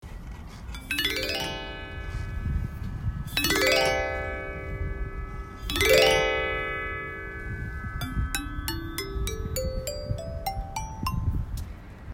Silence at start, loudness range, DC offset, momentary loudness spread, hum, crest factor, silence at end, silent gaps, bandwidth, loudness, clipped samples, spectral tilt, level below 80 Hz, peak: 0 s; 8 LU; under 0.1%; 16 LU; none; 24 dB; 0 s; none; 16.5 kHz; -28 LUFS; under 0.1%; -3.5 dB/octave; -36 dBFS; -6 dBFS